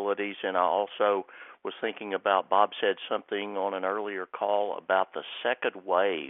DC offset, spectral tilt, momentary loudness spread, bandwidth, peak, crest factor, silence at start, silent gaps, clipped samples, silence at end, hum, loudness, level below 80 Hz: under 0.1%; -0.5 dB/octave; 8 LU; 3.9 kHz; -8 dBFS; 22 dB; 0 s; none; under 0.1%; 0 s; none; -29 LUFS; -84 dBFS